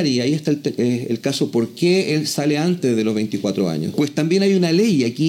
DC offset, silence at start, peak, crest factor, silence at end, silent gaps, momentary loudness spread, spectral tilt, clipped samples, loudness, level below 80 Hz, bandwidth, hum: under 0.1%; 0 s; -6 dBFS; 12 dB; 0 s; none; 5 LU; -5.5 dB/octave; under 0.1%; -19 LUFS; -66 dBFS; 16.5 kHz; none